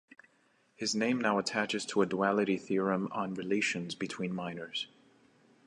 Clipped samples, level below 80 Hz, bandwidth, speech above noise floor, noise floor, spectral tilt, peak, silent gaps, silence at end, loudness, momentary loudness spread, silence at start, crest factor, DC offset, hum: under 0.1%; -74 dBFS; 11 kHz; 38 dB; -70 dBFS; -4.5 dB/octave; -14 dBFS; none; 0.8 s; -32 LUFS; 9 LU; 0.8 s; 20 dB; under 0.1%; none